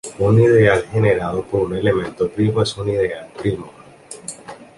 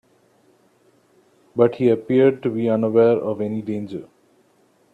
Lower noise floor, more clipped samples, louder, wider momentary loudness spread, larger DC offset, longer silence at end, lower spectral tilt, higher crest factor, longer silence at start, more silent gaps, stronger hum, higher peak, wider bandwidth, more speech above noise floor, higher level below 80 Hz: second, -39 dBFS vs -59 dBFS; neither; about the same, -18 LUFS vs -19 LUFS; first, 19 LU vs 13 LU; neither; second, 0.15 s vs 0.9 s; second, -6.5 dB/octave vs -9.5 dB/octave; about the same, 16 dB vs 20 dB; second, 0.05 s vs 1.55 s; neither; neither; about the same, -2 dBFS vs -2 dBFS; first, 11.5 kHz vs 4.8 kHz; second, 23 dB vs 41 dB; first, -44 dBFS vs -66 dBFS